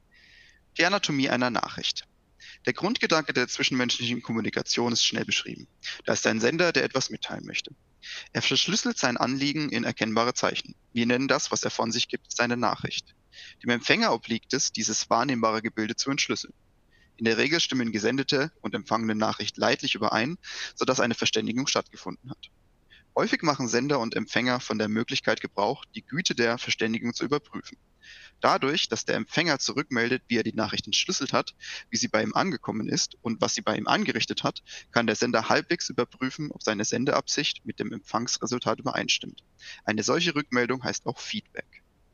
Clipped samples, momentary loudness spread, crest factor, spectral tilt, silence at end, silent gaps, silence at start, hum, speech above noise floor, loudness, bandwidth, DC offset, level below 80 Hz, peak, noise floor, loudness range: under 0.1%; 11 LU; 26 dB; -3 dB/octave; 0.35 s; none; 0.75 s; none; 34 dB; -26 LUFS; 10 kHz; under 0.1%; -64 dBFS; -2 dBFS; -61 dBFS; 2 LU